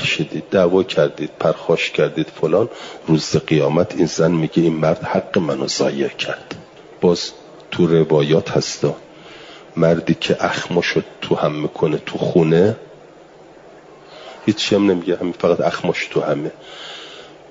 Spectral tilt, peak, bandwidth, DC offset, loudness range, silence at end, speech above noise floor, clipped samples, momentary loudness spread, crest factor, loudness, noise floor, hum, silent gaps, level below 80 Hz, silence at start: -5.5 dB/octave; -2 dBFS; 7.8 kHz; under 0.1%; 2 LU; 0.15 s; 26 dB; under 0.1%; 15 LU; 16 dB; -18 LUFS; -43 dBFS; none; none; -56 dBFS; 0 s